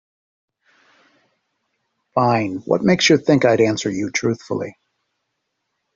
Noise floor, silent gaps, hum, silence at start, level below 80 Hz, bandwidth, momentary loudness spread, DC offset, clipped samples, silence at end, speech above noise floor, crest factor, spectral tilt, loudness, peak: -75 dBFS; none; none; 2.15 s; -60 dBFS; 7.8 kHz; 11 LU; under 0.1%; under 0.1%; 1.25 s; 58 dB; 18 dB; -5 dB/octave; -18 LUFS; -2 dBFS